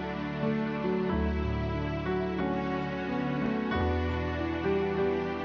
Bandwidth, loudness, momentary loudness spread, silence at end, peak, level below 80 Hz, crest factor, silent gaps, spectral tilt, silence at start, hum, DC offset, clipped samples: 6.8 kHz; -31 LUFS; 3 LU; 0 s; -18 dBFS; -40 dBFS; 12 dB; none; -8.5 dB/octave; 0 s; none; under 0.1%; under 0.1%